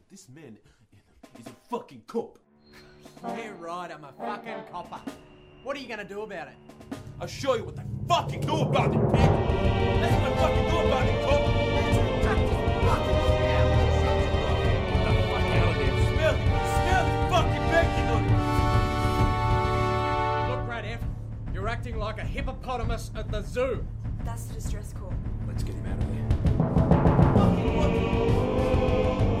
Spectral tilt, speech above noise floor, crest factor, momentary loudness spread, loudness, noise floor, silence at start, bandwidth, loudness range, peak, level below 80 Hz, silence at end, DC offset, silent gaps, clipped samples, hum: -7 dB/octave; 28 dB; 20 dB; 14 LU; -26 LUFS; -55 dBFS; 0.15 s; 14.5 kHz; 14 LU; -6 dBFS; -34 dBFS; 0 s; under 0.1%; none; under 0.1%; none